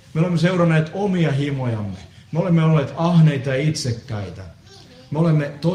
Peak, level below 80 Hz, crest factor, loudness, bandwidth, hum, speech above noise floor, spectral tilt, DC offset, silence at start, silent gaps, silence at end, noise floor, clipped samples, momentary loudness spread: -4 dBFS; -52 dBFS; 14 dB; -19 LUFS; 10.5 kHz; none; 26 dB; -7 dB/octave; under 0.1%; 0.15 s; none; 0 s; -44 dBFS; under 0.1%; 14 LU